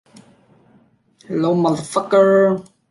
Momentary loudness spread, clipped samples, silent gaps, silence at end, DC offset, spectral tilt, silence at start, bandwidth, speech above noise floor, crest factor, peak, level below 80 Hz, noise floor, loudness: 11 LU; under 0.1%; none; 0.3 s; under 0.1%; -6.5 dB/octave; 1.3 s; 11.5 kHz; 40 dB; 16 dB; -2 dBFS; -64 dBFS; -55 dBFS; -17 LUFS